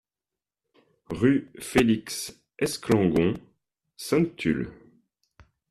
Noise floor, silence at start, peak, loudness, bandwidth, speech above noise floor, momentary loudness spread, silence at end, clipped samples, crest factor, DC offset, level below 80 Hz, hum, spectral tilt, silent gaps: under -90 dBFS; 1.1 s; -8 dBFS; -25 LUFS; 14.5 kHz; over 66 dB; 15 LU; 0.95 s; under 0.1%; 20 dB; under 0.1%; -54 dBFS; none; -5.5 dB/octave; none